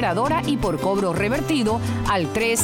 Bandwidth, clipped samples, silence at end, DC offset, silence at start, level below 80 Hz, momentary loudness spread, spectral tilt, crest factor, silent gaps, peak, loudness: 17.5 kHz; under 0.1%; 0 s; under 0.1%; 0 s; -40 dBFS; 2 LU; -4.5 dB/octave; 12 dB; none; -8 dBFS; -22 LUFS